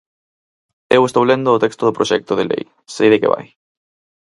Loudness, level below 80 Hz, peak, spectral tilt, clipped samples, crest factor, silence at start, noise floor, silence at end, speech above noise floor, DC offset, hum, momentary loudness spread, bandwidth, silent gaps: -16 LUFS; -60 dBFS; 0 dBFS; -5.5 dB/octave; under 0.1%; 16 dB; 0.9 s; under -90 dBFS; 0.8 s; over 75 dB; under 0.1%; none; 9 LU; 11.5 kHz; none